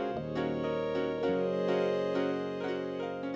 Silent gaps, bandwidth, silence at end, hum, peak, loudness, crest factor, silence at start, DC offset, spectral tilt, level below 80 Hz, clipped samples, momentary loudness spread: none; 8 kHz; 0 s; none; -20 dBFS; -32 LUFS; 12 dB; 0 s; under 0.1%; -7 dB/octave; -60 dBFS; under 0.1%; 5 LU